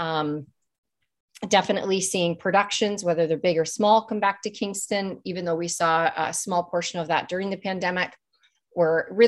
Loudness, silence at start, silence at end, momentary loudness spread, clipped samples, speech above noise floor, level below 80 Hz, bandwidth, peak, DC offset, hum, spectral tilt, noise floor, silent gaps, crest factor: -24 LUFS; 0 s; 0 s; 8 LU; under 0.1%; 42 dB; -68 dBFS; 13 kHz; -4 dBFS; under 0.1%; none; -3.5 dB/octave; -66 dBFS; 0.78-0.83 s, 1.20-1.28 s; 20 dB